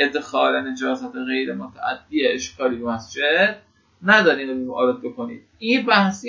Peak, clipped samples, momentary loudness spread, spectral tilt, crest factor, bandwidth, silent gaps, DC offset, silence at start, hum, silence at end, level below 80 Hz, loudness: 0 dBFS; under 0.1%; 13 LU; -4 dB/octave; 20 dB; 7.6 kHz; none; under 0.1%; 0 s; none; 0 s; -60 dBFS; -21 LUFS